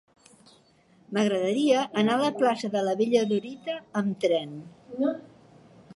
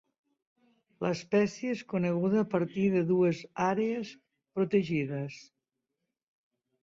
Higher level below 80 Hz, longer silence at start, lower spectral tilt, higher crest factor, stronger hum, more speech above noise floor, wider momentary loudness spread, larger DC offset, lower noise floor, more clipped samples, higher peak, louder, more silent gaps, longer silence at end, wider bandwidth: about the same, -74 dBFS vs -70 dBFS; about the same, 1.1 s vs 1 s; second, -5.5 dB/octave vs -7.5 dB/octave; about the same, 18 dB vs 16 dB; neither; second, 35 dB vs 57 dB; about the same, 12 LU vs 11 LU; neither; second, -60 dBFS vs -86 dBFS; neither; first, -8 dBFS vs -14 dBFS; first, -26 LUFS vs -30 LUFS; neither; second, 0.75 s vs 1.4 s; first, 11.5 kHz vs 7.6 kHz